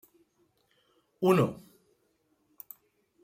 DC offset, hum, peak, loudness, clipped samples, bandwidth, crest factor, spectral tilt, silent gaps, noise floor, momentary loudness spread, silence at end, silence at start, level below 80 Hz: under 0.1%; none; -12 dBFS; -27 LUFS; under 0.1%; 16 kHz; 22 dB; -7.5 dB/octave; none; -73 dBFS; 26 LU; 1.65 s; 1.2 s; -72 dBFS